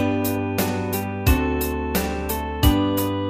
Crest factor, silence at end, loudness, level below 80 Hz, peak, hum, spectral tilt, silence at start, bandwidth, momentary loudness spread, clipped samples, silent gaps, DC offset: 18 dB; 0 s; -22 LUFS; -28 dBFS; -4 dBFS; none; -5.5 dB/octave; 0 s; 15.5 kHz; 6 LU; under 0.1%; none; under 0.1%